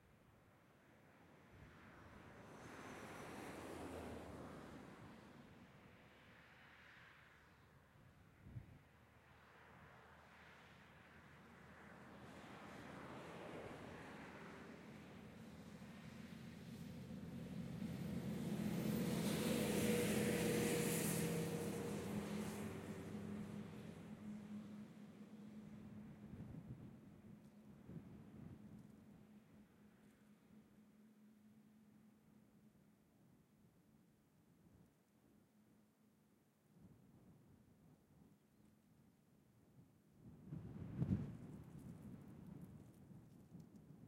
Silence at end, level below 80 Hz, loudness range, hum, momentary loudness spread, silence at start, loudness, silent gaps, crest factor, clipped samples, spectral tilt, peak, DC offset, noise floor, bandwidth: 0 s; -74 dBFS; 23 LU; none; 27 LU; 0 s; -48 LUFS; none; 24 dB; under 0.1%; -5 dB/octave; -28 dBFS; under 0.1%; -76 dBFS; 16.5 kHz